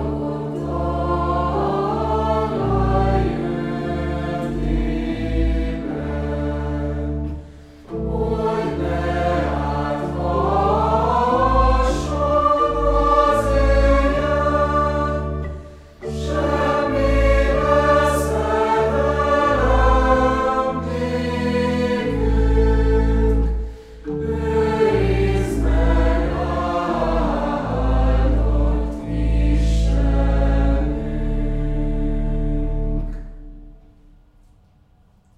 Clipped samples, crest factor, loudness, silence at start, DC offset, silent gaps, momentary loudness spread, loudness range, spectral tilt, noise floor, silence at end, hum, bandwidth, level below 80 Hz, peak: under 0.1%; 16 dB; -20 LUFS; 0 s; under 0.1%; none; 8 LU; 7 LU; -7.5 dB/octave; -54 dBFS; 1.65 s; none; 11.5 kHz; -24 dBFS; -4 dBFS